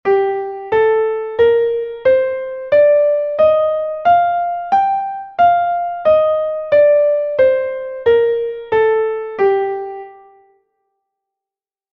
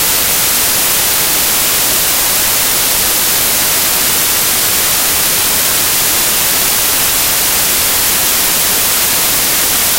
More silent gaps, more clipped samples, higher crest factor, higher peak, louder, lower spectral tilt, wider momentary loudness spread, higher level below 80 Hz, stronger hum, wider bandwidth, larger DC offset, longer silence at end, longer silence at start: neither; neither; about the same, 12 dB vs 12 dB; about the same, -2 dBFS vs 0 dBFS; second, -15 LUFS vs -9 LUFS; first, -6.5 dB/octave vs 0 dB/octave; first, 9 LU vs 0 LU; second, -54 dBFS vs -36 dBFS; neither; second, 5.4 kHz vs over 20 kHz; neither; first, 1.8 s vs 0 s; about the same, 0.05 s vs 0 s